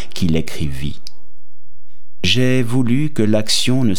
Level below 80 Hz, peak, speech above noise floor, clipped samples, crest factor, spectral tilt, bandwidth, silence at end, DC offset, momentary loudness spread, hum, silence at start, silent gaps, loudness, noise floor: -40 dBFS; -2 dBFS; 33 dB; under 0.1%; 16 dB; -5 dB/octave; 18 kHz; 0 s; 20%; 11 LU; none; 0 s; none; -18 LUFS; -50 dBFS